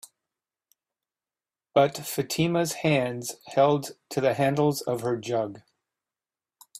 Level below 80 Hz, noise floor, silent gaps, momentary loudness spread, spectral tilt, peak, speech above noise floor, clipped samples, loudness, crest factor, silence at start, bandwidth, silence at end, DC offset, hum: -66 dBFS; under -90 dBFS; none; 8 LU; -5 dB/octave; -8 dBFS; over 65 dB; under 0.1%; -26 LUFS; 20 dB; 1.75 s; 16 kHz; 0 s; under 0.1%; none